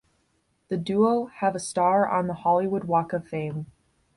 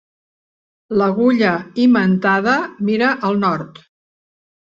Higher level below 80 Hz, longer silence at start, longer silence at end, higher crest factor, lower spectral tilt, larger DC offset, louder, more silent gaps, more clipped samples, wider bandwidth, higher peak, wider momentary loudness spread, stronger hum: about the same, -62 dBFS vs -58 dBFS; second, 0.7 s vs 0.9 s; second, 0.5 s vs 0.95 s; about the same, 16 dB vs 16 dB; about the same, -6.5 dB/octave vs -7.5 dB/octave; neither; second, -25 LUFS vs -16 LUFS; neither; neither; first, 11.5 kHz vs 7.2 kHz; second, -10 dBFS vs -2 dBFS; first, 10 LU vs 6 LU; neither